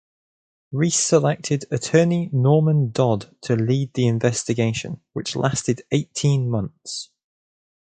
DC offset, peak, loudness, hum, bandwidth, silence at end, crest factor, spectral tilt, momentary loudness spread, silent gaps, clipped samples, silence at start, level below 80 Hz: under 0.1%; -2 dBFS; -21 LUFS; none; 9.4 kHz; 0.85 s; 20 dB; -5.5 dB/octave; 12 LU; none; under 0.1%; 0.7 s; -56 dBFS